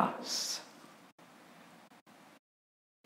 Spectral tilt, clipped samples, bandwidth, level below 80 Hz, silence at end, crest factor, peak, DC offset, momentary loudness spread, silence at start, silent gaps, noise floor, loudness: -2 dB/octave; under 0.1%; 16 kHz; under -90 dBFS; 0.75 s; 30 dB; -12 dBFS; under 0.1%; 25 LU; 0 s; 1.12-1.18 s, 2.01-2.06 s; -58 dBFS; -36 LUFS